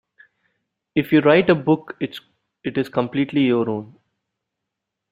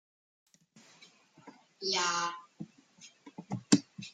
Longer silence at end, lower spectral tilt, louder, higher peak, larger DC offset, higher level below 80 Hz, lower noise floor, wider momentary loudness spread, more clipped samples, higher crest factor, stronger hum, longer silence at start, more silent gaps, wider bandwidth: first, 1.25 s vs 0.05 s; first, -8.5 dB/octave vs -3 dB/octave; first, -20 LUFS vs -32 LUFS; first, -2 dBFS vs -8 dBFS; neither; first, -60 dBFS vs -80 dBFS; first, -82 dBFS vs -62 dBFS; second, 15 LU vs 25 LU; neither; second, 20 dB vs 28 dB; neither; second, 0.95 s vs 1.45 s; neither; first, 15.5 kHz vs 9.6 kHz